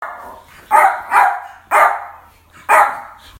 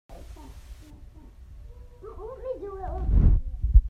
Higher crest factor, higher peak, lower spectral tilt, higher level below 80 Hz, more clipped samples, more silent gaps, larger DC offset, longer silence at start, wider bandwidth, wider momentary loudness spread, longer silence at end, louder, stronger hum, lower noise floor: second, 16 dB vs 22 dB; first, 0 dBFS vs -4 dBFS; second, -1.5 dB/octave vs -10 dB/octave; second, -56 dBFS vs -26 dBFS; neither; neither; neither; about the same, 0 s vs 0.1 s; first, 17 kHz vs 2.4 kHz; second, 19 LU vs 26 LU; first, 0.35 s vs 0 s; first, -13 LUFS vs -28 LUFS; neither; about the same, -44 dBFS vs -46 dBFS